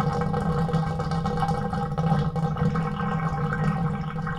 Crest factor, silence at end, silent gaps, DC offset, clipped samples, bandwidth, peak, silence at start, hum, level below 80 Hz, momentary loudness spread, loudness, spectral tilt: 14 dB; 0 s; none; under 0.1%; under 0.1%; 10 kHz; -12 dBFS; 0 s; none; -40 dBFS; 3 LU; -26 LUFS; -8 dB/octave